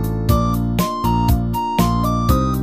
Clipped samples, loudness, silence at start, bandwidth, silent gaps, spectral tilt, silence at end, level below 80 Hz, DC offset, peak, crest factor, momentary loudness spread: under 0.1%; -18 LUFS; 0 s; 15.5 kHz; none; -7 dB/octave; 0 s; -24 dBFS; 0.6%; -2 dBFS; 16 dB; 2 LU